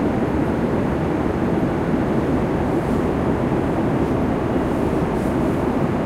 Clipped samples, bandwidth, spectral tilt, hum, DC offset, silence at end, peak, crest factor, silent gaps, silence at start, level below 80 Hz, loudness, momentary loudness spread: under 0.1%; 15 kHz; -8.5 dB/octave; none; under 0.1%; 0 s; -6 dBFS; 14 dB; none; 0 s; -34 dBFS; -20 LUFS; 1 LU